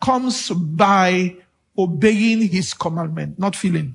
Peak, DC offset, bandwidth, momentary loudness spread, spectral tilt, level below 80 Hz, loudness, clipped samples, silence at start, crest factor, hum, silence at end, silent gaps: 0 dBFS; under 0.1%; 11 kHz; 9 LU; -5.5 dB/octave; -54 dBFS; -18 LUFS; under 0.1%; 0 s; 18 dB; none; 0 s; none